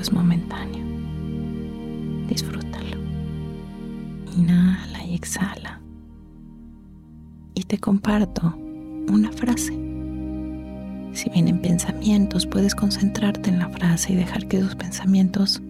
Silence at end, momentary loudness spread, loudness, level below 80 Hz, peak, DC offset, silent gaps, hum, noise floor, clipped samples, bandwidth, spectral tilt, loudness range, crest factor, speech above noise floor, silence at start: 0 s; 14 LU; -23 LUFS; -40 dBFS; -8 dBFS; under 0.1%; none; none; -43 dBFS; under 0.1%; 15 kHz; -5.5 dB/octave; 8 LU; 14 dB; 23 dB; 0 s